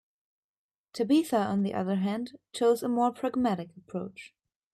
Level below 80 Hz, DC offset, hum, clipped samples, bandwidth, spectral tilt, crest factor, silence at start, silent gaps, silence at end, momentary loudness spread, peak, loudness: -72 dBFS; under 0.1%; none; under 0.1%; 14 kHz; -6.5 dB/octave; 16 dB; 0.95 s; none; 0.45 s; 14 LU; -14 dBFS; -29 LUFS